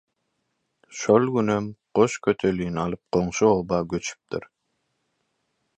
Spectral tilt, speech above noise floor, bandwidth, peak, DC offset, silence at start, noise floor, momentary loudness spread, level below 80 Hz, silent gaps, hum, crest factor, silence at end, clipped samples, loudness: -6 dB/octave; 53 dB; 9.2 kHz; -4 dBFS; under 0.1%; 0.9 s; -76 dBFS; 12 LU; -52 dBFS; none; none; 22 dB; 1.35 s; under 0.1%; -23 LUFS